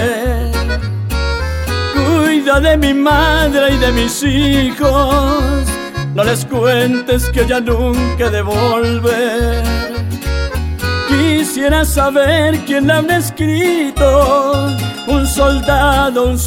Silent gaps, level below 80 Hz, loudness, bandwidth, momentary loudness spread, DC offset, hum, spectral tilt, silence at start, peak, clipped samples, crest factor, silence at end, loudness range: none; -20 dBFS; -13 LUFS; 17.5 kHz; 7 LU; under 0.1%; none; -5 dB/octave; 0 s; 0 dBFS; under 0.1%; 12 dB; 0 s; 3 LU